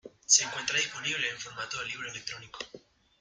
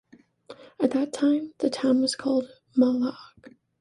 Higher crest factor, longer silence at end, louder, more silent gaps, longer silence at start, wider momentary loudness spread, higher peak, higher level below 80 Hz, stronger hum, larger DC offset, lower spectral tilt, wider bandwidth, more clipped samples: first, 26 dB vs 16 dB; about the same, 0.4 s vs 0.3 s; second, -29 LUFS vs -25 LUFS; neither; second, 0.05 s vs 0.5 s; first, 18 LU vs 6 LU; about the same, -8 dBFS vs -10 dBFS; about the same, -70 dBFS vs -70 dBFS; neither; neither; second, 1 dB/octave vs -4.5 dB/octave; first, 13.5 kHz vs 11.5 kHz; neither